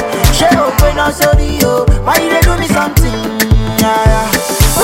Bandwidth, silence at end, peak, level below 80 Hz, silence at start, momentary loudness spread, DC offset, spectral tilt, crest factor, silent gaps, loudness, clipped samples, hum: 17.5 kHz; 0 s; 0 dBFS; -16 dBFS; 0 s; 3 LU; under 0.1%; -4.5 dB/octave; 10 dB; none; -11 LUFS; under 0.1%; none